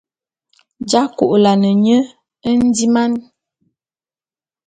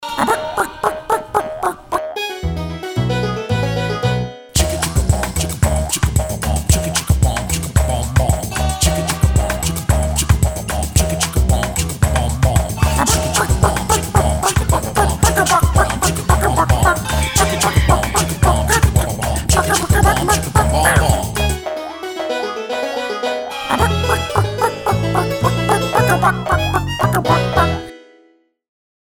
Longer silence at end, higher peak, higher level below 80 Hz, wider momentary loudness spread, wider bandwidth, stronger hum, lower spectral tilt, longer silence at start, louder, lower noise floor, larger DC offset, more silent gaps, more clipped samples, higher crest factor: first, 1.45 s vs 1.1 s; about the same, 0 dBFS vs 0 dBFS; second, -54 dBFS vs -22 dBFS; first, 13 LU vs 8 LU; second, 9.4 kHz vs over 20 kHz; neither; about the same, -5.5 dB/octave vs -4.5 dB/octave; first, 0.8 s vs 0 s; about the same, -14 LUFS vs -16 LUFS; first, under -90 dBFS vs -54 dBFS; neither; neither; neither; about the same, 16 dB vs 16 dB